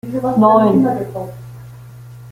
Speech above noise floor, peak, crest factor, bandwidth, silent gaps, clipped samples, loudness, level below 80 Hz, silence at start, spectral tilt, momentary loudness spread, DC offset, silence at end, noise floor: 22 dB; -2 dBFS; 14 dB; 16 kHz; none; under 0.1%; -14 LUFS; -50 dBFS; 0.05 s; -9 dB/octave; 24 LU; under 0.1%; 0 s; -36 dBFS